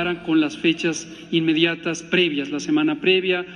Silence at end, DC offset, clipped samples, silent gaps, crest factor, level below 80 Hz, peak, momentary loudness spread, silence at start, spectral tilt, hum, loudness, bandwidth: 0 s; under 0.1%; under 0.1%; none; 18 dB; -60 dBFS; -4 dBFS; 7 LU; 0 s; -4.5 dB/octave; none; -20 LUFS; 10 kHz